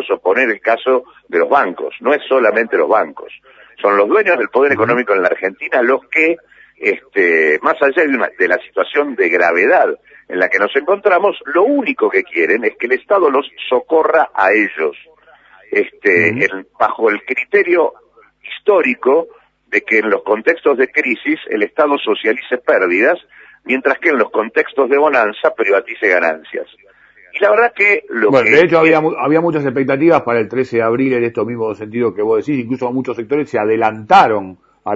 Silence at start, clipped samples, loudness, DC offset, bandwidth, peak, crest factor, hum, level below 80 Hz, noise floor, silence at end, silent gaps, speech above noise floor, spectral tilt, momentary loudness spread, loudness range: 0 s; under 0.1%; -14 LUFS; under 0.1%; 7.4 kHz; 0 dBFS; 14 dB; none; -62 dBFS; -46 dBFS; 0 s; none; 32 dB; -6.5 dB/octave; 8 LU; 3 LU